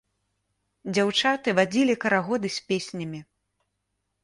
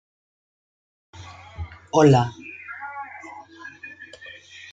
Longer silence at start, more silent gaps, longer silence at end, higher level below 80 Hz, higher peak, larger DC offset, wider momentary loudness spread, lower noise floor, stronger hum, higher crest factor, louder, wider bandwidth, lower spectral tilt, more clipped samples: second, 0.85 s vs 1.2 s; neither; first, 1 s vs 0.65 s; second, -68 dBFS vs -54 dBFS; second, -8 dBFS vs -4 dBFS; neither; second, 14 LU vs 25 LU; first, -78 dBFS vs -44 dBFS; first, 50 Hz at -50 dBFS vs none; about the same, 18 dB vs 22 dB; second, -24 LUFS vs -20 LUFS; first, 11.5 kHz vs 9 kHz; second, -4.5 dB/octave vs -6.5 dB/octave; neither